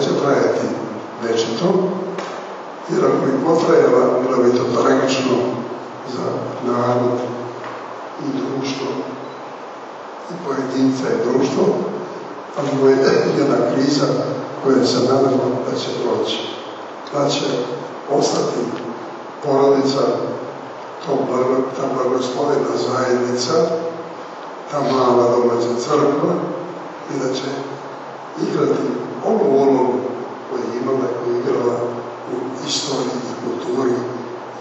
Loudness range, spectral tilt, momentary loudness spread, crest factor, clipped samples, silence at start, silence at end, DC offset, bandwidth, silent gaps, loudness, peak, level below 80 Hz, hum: 6 LU; -5.5 dB/octave; 15 LU; 16 dB; under 0.1%; 0 s; 0 s; under 0.1%; 8.2 kHz; none; -19 LUFS; -2 dBFS; -68 dBFS; none